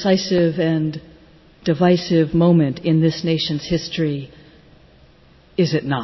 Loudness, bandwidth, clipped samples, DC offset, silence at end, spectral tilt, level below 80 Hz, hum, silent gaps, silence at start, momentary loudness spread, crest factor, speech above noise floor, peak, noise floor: -19 LUFS; 6.2 kHz; under 0.1%; under 0.1%; 0 s; -7 dB/octave; -48 dBFS; none; none; 0 s; 11 LU; 14 dB; 32 dB; -4 dBFS; -50 dBFS